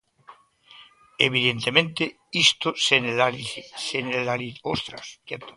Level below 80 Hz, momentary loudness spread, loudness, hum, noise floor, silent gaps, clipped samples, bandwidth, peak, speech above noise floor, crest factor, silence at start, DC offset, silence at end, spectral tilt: -62 dBFS; 14 LU; -22 LUFS; none; -52 dBFS; none; under 0.1%; 11.5 kHz; 0 dBFS; 27 dB; 26 dB; 0.3 s; under 0.1%; 0.05 s; -3 dB/octave